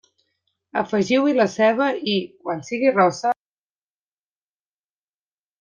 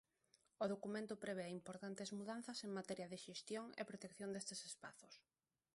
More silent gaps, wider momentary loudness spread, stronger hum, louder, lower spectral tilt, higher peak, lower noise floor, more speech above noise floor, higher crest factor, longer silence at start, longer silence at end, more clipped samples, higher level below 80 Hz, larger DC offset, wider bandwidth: neither; first, 11 LU vs 8 LU; first, 50 Hz at -50 dBFS vs none; first, -21 LUFS vs -50 LUFS; about the same, -5 dB/octave vs -4 dB/octave; first, -6 dBFS vs -30 dBFS; first, under -90 dBFS vs -80 dBFS; first, over 70 dB vs 30 dB; about the same, 18 dB vs 20 dB; first, 0.75 s vs 0.6 s; first, 2.25 s vs 0.55 s; neither; first, -68 dBFS vs -88 dBFS; neither; second, 9.4 kHz vs 11.5 kHz